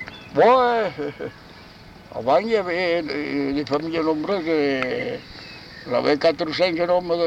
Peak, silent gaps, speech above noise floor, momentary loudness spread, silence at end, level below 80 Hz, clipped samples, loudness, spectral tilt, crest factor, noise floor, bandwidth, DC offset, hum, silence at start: -6 dBFS; none; 23 dB; 17 LU; 0 s; -54 dBFS; under 0.1%; -21 LUFS; -6 dB/octave; 16 dB; -44 dBFS; 9 kHz; under 0.1%; none; 0 s